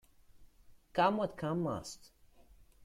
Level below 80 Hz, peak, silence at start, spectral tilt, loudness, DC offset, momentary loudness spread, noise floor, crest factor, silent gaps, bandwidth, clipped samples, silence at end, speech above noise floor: -64 dBFS; -16 dBFS; 0.35 s; -6 dB/octave; -35 LUFS; under 0.1%; 16 LU; -61 dBFS; 22 dB; none; 15.5 kHz; under 0.1%; 0 s; 27 dB